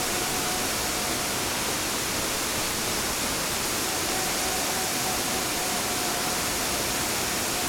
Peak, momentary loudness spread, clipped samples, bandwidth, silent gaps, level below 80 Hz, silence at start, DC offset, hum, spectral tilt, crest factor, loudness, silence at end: -14 dBFS; 1 LU; under 0.1%; 19.5 kHz; none; -46 dBFS; 0 s; under 0.1%; none; -1.5 dB/octave; 14 dB; -25 LUFS; 0 s